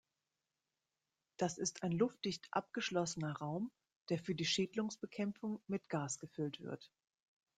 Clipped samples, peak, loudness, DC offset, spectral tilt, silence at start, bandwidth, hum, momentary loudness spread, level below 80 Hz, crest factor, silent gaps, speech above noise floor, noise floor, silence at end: under 0.1%; -22 dBFS; -41 LUFS; under 0.1%; -4.5 dB/octave; 1.4 s; 9.6 kHz; none; 8 LU; -80 dBFS; 20 dB; 3.96-4.06 s; over 50 dB; under -90 dBFS; 0.7 s